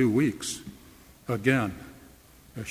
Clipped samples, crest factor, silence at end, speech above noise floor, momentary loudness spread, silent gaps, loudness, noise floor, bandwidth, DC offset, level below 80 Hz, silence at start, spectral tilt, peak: under 0.1%; 20 dB; 0 s; 28 dB; 21 LU; none; -28 LUFS; -53 dBFS; 16 kHz; under 0.1%; -56 dBFS; 0 s; -5.5 dB/octave; -8 dBFS